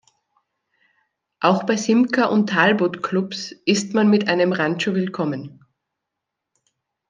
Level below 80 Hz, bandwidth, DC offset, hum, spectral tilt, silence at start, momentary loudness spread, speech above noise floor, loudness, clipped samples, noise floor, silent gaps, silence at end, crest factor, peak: -70 dBFS; 9.6 kHz; under 0.1%; none; -5 dB/octave; 1.4 s; 9 LU; 63 dB; -19 LUFS; under 0.1%; -82 dBFS; none; 1.6 s; 20 dB; -2 dBFS